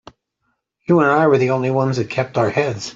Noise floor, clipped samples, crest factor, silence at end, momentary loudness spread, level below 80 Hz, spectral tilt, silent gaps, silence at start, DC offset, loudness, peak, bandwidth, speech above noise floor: -71 dBFS; under 0.1%; 16 dB; 0.05 s; 7 LU; -58 dBFS; -6.5 dB/octave; none; 0.9 s; under 0.1%; -17 LUFS; -2 dBFS; 7.8 kHz; 55 dB